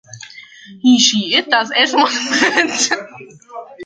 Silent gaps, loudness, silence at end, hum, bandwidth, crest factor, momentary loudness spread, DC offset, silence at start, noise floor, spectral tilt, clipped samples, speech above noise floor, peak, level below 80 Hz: none; -13 LUFS; 0 s; none; 9.4 kHz; 16 dB; 23 LU; under 0.1%; 0.1 s; -38 dBFS; -1.5 dB/octave; under 0.1%; 22 dB; 0 dBFS; -64 dBFS